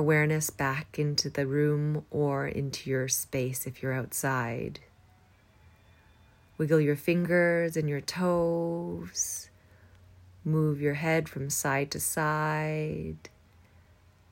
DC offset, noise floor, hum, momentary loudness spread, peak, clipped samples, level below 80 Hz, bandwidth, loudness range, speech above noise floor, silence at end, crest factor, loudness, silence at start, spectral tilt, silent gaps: under 0.1%; -60 dBFS; none; 10 LU; -12 dBFS; under 0.1%; -62 dBFS; 16.5 kHz; 4 LU; 32 dB; 1.05 s; 18 dB; -29 LUFS; 0 s; -5 dB/octave; none